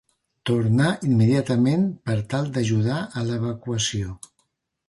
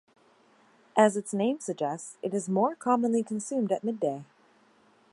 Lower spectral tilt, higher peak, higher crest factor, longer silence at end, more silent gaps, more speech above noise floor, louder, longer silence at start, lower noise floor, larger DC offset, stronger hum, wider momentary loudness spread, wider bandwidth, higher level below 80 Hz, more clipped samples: about the same, -6 dB/octave vs -5.5 dB/octave; about the same, -8 dBFS vs -8 dBFS; second, 14 dB vs 22 dB; second, 0.7 s vs 0.9 s; neither; first, 50 dB vs 35 dB; first, -23 LUFS vs -28 LUFS; second, 0.45 s vs 0.95 s; first, -71 dBFS vs -62 dBFS; neither; neither; about the same, 8 LU vs 9 LU; about the same, 11.5 kHz vs 11.5 kHz; first, -50 dBFS vs -82 dBFS; neither